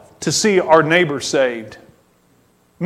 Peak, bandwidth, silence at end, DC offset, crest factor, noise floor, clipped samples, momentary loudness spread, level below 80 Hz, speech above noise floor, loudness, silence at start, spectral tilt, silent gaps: 0 dBFS; 14.5 kHz; 0 s; under 0.1%; 18 dB; -56 dBFS; under 0.1%; 8 LU; -58 dBFS; 41 dB; -15 LUFS; 0.2 s; -3.5 dB/octave; none